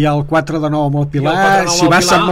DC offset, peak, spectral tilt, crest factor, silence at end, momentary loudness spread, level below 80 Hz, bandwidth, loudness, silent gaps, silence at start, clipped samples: under 0.1%; -4 dBFS; -4.5 dB/octave; 10 dB; 0 s; 6 LU; -38 dBFS; 16.5 kHz; -13 LUFS; none; 0 s; under 0.1%